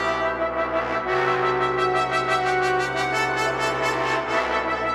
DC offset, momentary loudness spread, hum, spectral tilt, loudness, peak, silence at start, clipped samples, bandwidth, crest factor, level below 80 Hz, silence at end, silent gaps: under 0.1%; 3 LU; none; -4 dB/octave; -22 LUFS; -10 dBFS; 0 s; under 0.1%; 15.5 kHz; 12 dB; -48 dBFS; 0 s; none